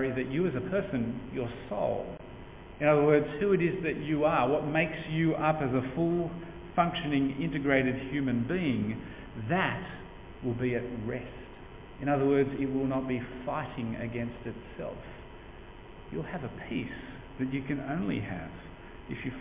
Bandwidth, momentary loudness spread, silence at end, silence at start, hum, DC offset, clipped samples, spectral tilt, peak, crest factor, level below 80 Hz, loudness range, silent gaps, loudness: 3.9 kHz; 19 LU; 0 s; 0 s; none; under 0.1%; under 0.1%; -6 dB/octave; -10 dBFS; 20 dB; -52 dBFS; 10 LU; none; -31 LUFS